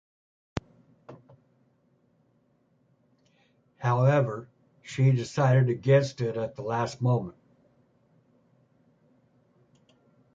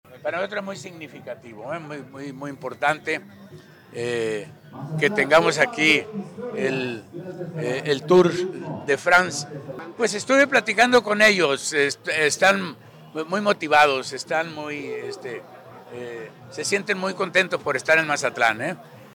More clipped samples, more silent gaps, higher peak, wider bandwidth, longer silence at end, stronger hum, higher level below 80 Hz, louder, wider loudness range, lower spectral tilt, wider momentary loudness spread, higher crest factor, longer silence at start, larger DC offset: neither; neither; about the same, -8 dBFS vs -6 dBFS; second, 7.8 kHz vs 19.5 kHz; first, 3.05 s vs 0.05 s; neither; about the same, -62 dBFS vs -66 dBFS; second, -26 LUFS vs -21 LUFS; first, 14 LU vs 10 LU; first, -7.5 dB/octave vs -3.5 dB/octave; second, 16 LU vs 19 LU; about the same, 20 dB vs 18 dB; first, 0.55 s vs 0.1 s; neither